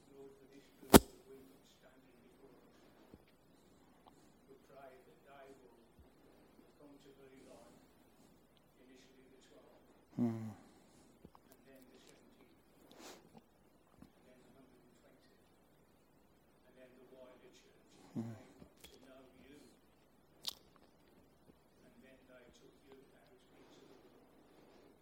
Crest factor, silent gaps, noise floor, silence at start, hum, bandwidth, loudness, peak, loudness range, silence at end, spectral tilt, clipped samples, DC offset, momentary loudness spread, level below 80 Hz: 40 dB; none; -70 dBFS; 0.9 s; none; 16.5 kHz; -34 LUFS; -6 dBFS; 17 LU; 4.5 s; -4.5 dB/octave; under 0.1%; under 0.1%; 24 LU; -60 dBFS